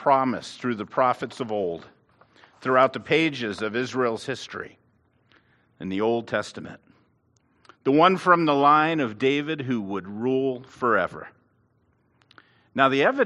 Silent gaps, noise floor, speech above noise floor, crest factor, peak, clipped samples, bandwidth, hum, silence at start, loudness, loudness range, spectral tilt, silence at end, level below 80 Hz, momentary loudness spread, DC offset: none; -66 dBFS; 43 dB; 22 dB; -2 dBFS; under 0.1%; 11.5 kHz; none; 0 s; -23 LUFS; 8 LU; -6 dB/octave; 0 s; -70 dBFS; 15 LU; under 0.1%